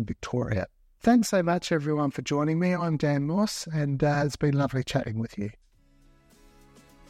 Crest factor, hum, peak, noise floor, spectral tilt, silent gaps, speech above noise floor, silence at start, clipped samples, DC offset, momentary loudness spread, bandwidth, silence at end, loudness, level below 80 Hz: 18 dB; none; -8 dBFS; -59 dBFS; -6.5 dB/octave; none; 33 dB; 0 s; under 0.1%; under 0.1%; 9 LU; 14.5 kHz; 1.6 s; -27 LUFS; -52 dBFS